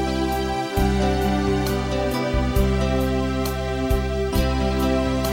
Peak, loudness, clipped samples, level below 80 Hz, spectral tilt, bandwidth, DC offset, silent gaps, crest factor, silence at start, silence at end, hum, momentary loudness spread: -8 dBFS; -22 LUFS; under 0.1%; -26 dBFS; -6 dB/octave; 16.5 kHz; under 0.1%; none; 14 dB; 0 s; 0 s; none; 3 LU